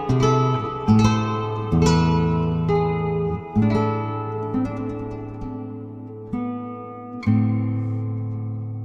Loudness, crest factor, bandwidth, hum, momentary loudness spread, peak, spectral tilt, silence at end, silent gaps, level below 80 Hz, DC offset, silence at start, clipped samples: -22 LUFS; 18 dB; 8.2 kHz; none; 14 LU; -4 dBFS; -7.5 dB/octave; 0 s; none; -40 dBFS; under 0.1%; 0 s; under 0.1%